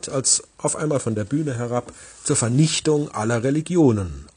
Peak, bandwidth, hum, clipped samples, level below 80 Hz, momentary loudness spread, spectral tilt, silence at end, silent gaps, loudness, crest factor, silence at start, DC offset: -4 dBFS; 10 kHz; none; under 0.1%; -48 dBFS; 8 LU; -4.5 dB/octave; 0.1 s; none; -21 LUFS; 18 dB; 0.05 s; under 0.1%